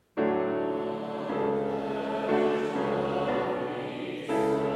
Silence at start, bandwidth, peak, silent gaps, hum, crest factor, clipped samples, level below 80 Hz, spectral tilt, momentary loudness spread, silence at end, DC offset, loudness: 0.15 s; 12 kHz; -14 dBFS; none; none; 16 dB; under 0.1%; -62 dBFS; -7 dB/octave; 7 LU; 0 s; under 0.1%; -29 LUFS